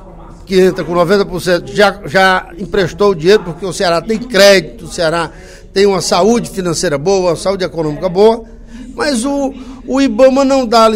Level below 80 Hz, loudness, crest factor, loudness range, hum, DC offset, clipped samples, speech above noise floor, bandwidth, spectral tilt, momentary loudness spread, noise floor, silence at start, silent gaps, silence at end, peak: -36 dBFS; -12 LUFS; 12 dB; 3 LU; none; under 0.1%; 0.3%; 21 dB; 16.5 kHz; -4.5 dB/octave; 10 LU; -32 dBFS; 0 s; none; 0 s; 0 dBFS